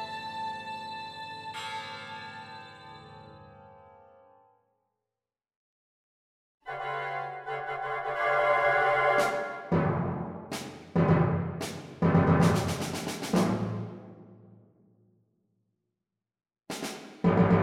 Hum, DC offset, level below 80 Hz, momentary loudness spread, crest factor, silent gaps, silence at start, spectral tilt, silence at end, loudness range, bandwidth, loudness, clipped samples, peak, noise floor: none; under 0.1%; -58 dBFS; 18 LU; 20 dB; 5.56-6.58 s; 0 s; -6.5 dB/octave; 0 s; 18 LU; 15.5 kHz; -29 LUFS; under 0.1%; -10 dBFS; under -90 dBFS